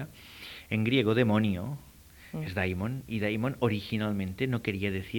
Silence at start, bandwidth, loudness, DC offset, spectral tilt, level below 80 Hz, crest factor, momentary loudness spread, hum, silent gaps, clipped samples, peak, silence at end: 0 s; 19 kHz; -30 LUFS; under 0.1%; -7 dB/octave; -56 dBFS; 18 dB; 18 LU; none; none; under 0.1%; -12 dBFS; 0 s